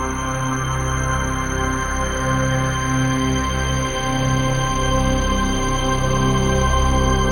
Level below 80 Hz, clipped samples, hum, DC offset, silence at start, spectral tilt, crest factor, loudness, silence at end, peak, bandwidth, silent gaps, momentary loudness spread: -24 dBFS; under 0.1%; none; 0.1%; 0 s; -4.5 dB/octave; 14 dB; -20 LUFS; 0 s; -4 dBFS; 17 kHz; none; 4 LU